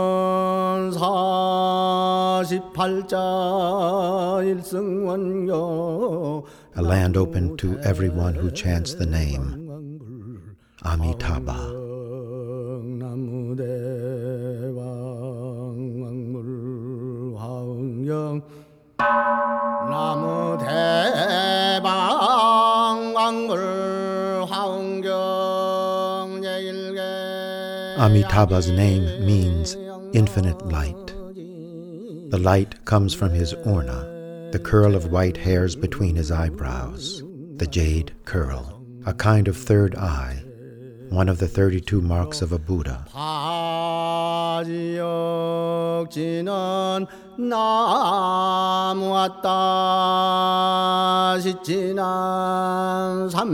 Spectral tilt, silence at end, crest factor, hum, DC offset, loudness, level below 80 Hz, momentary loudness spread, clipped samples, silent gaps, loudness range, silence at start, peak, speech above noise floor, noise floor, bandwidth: -6 dB/octave; 0 s; 18 dB; none; under 0.1%; -22 LUFS; -38 dBFS; 13 LU; under 0.1%; none; 10 LU; 0 s; -4 dBFS; 22 dB; -44 dBFS; 16.5 kHz